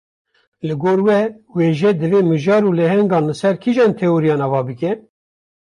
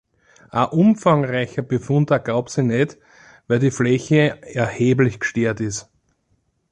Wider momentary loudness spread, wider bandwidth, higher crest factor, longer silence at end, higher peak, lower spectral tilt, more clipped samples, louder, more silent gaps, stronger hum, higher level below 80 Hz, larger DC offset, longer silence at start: about the same, 8 LU vs 8 LU; about the same, 11 kHz vs 10 kHz; about the same, 12 dB vs 16 dB; second, 0.75 s vs 0.9 s; about the same, -4 dBFS vs -4 dBFS; first, -8 dB/octave vs -6.5 dB/octave; neither; first, -16 LUFS vs -19 LUFS; neither; neither; about the same, -58 dBFS vs -54 dBFS; neither; about the same, 0.65 s vs 0.55 s